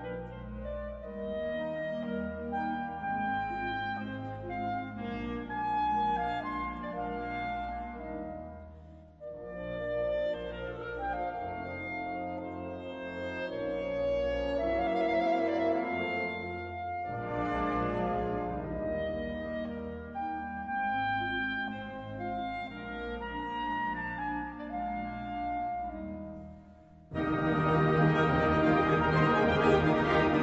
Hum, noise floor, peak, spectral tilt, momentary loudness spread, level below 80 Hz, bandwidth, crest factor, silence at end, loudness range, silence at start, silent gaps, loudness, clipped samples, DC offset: none; -54 dBFS; -12 dBFS; -8 dB/octave; 14 LU; -50 dBFS; 8 kHz; 20 dB; 0 s; 8 LU; 0 s; none; -33 LUFS; under 0.1%; under 0.1%